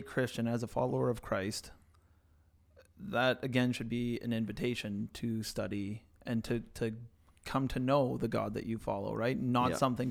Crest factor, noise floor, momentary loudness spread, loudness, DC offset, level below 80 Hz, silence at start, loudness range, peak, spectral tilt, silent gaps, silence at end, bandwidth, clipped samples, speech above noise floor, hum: 20 dB; -66 dBFS; 9 LU; -35 LUFS; under 0.1%; -56 dBFS; 0 s; 3 LU; -16 dBFS; -6 dB/octave; none; 0 s; 16.5 kHz; under 0.1%; 32 dB; none